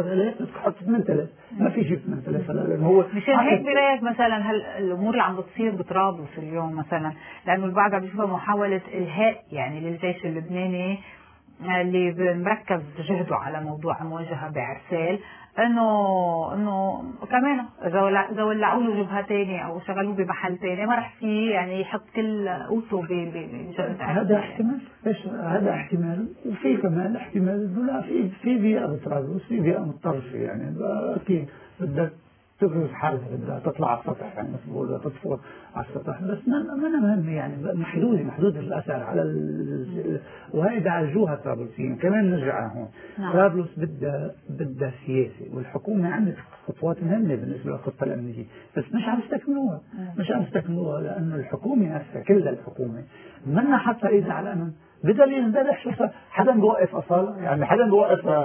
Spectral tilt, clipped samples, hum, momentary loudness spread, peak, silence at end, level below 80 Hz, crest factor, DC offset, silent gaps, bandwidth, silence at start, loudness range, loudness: -11 dB/octave; under 0.1%; none; 11 LU; -4 dBFS; 0 s; -62 dBFS; 22 dB; under 0.1%; none; 3.5 kHz; 0 s; 6 LU; -25 LUFS